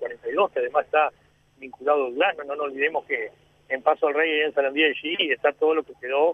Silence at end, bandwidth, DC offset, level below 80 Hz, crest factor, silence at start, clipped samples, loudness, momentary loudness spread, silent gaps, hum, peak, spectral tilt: 0 s; 3.8 kHz; under 0.1%; -70 dBFS; 20 dB; 0 s; under 0.1%; -23 LUFS; 8 LU; none; none; -4 dBFS; -5 dB/octave